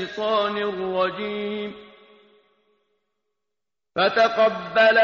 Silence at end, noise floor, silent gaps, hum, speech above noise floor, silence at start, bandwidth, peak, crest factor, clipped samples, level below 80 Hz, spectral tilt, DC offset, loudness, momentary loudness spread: 0 s; -87 dBFS; none; none; 66 dB; 0 s; 7 kHz; -6 dBFS; 16 dB; under 0.1%; -66 dBFS; -1 dB/octave; under 0.1%; -22 LUFS; 12 LU